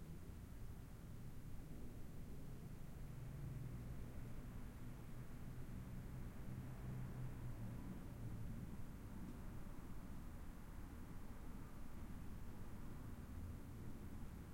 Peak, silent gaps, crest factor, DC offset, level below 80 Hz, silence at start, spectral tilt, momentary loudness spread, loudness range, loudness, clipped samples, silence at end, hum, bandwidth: -38 dBFS; none; 12 dB; under 0.1%; -56 dBFS; 0 s; -7 dB/octave; 5 LU; 4 LU; -55 LUFS; under 0.1%; 0 s; none; 16.5 kHz